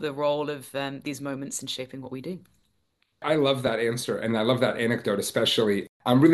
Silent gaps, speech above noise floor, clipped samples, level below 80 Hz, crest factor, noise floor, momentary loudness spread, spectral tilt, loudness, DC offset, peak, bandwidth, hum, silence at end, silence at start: 5.89-6.00 s; 47 dB; under 0.1%; -66 dBFS; 18 dB; -72 dBFS; 12 LU; -5 dB/octave; -26 LUFS; under 0.1%; -6 dBFS; 12.5 kHz; none; 0 s; 0 s